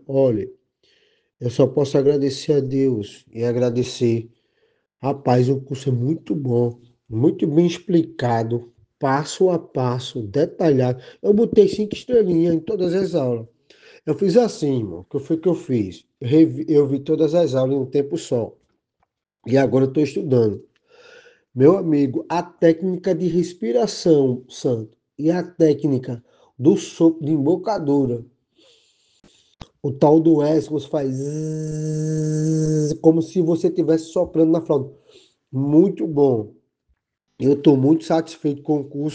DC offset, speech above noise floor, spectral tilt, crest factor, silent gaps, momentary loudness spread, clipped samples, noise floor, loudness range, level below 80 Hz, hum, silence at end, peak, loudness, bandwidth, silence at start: under 0.1%; 53 dB; -7.5 dB/octave; 18 dB; none; 10 LU; under 0.1%; -71 dBFS; 3 LU; -60 dBFS; none; 0 s; -2 dBFS; -20 LUFS; 9.2 kHz; 0.1 s